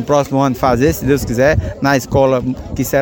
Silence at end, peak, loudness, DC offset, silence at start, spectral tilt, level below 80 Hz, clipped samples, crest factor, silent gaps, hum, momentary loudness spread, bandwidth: 0 s; 0 dBFS; -15 LUFS; under 0.1%; 0 s; -6 dB/octave; -30 dBFS; under 0.1%; 14 dB; none; none; 4 LU; 17 kHz